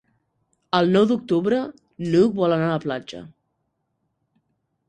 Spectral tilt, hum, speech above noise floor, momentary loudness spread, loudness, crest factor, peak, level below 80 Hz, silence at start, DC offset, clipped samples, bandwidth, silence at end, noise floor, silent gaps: -7.5 dB/octave; none; 54 dB; 15 LU; -21 LUFS; 20 dB; -4 dBFS; -62 dBFS; 0.75 s; under 0.1%; under 0.1%; 9.6 kHz; 1.6 s; -74 dBFS; none